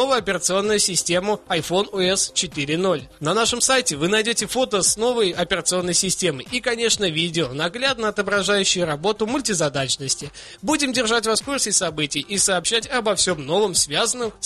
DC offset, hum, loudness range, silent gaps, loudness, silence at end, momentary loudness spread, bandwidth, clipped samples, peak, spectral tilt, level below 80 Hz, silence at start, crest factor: under 0.1%; none; 2 LU; none; -20 LUFS; 0 s; 5 LU; 13 kHz; under 0.1%; -4 dBFS; -2.5 dB/octave; -50 dBFS; 0 s; 16 dB